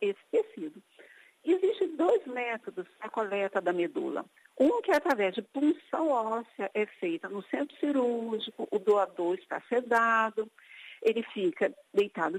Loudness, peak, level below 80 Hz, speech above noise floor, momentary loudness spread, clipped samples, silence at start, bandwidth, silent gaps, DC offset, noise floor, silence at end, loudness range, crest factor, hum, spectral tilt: -30 LUFS; -12 dBFS; -80 dBFS; 27 dB; 11 LU; under 0.1%; 0 s; 15.5 kHz; none; under 0.1%; -57 dBFS; 0 s; 2 LU; 18 dB; none; -5.5 dB/octave